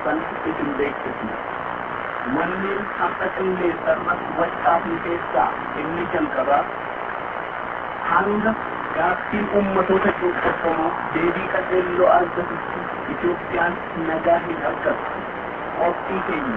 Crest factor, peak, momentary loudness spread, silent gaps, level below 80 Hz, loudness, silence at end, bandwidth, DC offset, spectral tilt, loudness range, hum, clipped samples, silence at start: 18 dB; -4 dBFS; 9 LU; none; -50 dBFS; -22 LUFS; 0 s; 4.9 kHz; under 0.1%; -8.5 dB/octave; 3 LU; none; under 0.1%; 0 s